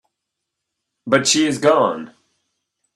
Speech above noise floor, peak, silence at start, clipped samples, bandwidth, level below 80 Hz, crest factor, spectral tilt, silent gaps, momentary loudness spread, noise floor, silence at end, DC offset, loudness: 63 dB; 0 dBFS; 1.05 s; under 0.1%; 13 kHz; -64 dBFS; 20 dB; -3 dB/octave; none; 14 LU; -80 dBFS; 0.9 s; under 0.1%; -16 LUFS